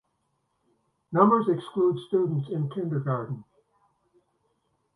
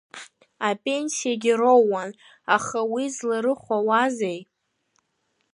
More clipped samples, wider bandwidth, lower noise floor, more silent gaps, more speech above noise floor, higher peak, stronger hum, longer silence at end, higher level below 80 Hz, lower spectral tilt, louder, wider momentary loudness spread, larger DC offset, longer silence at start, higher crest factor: neither; about the same, 11 kHz vs 11.5 kHz; about the same, -75 dBFS vs -73 dBFS; neither; about the same, 50 dB vs 50 dB; about the same, -6 dBFS vs -4 dBFS; neither; first, 1.55 s vs 1.1 s; about the same, -72 dBFS vs -74 dBFS; first, -10 dB/octave vs -3.5 dB/octave; second, -26 LUFS vs -23 LUFS; second, 11 LU vs 17 LU; neither; first, 1.1 s vs 0.15 s; about the same, 22 dB vs 20 dB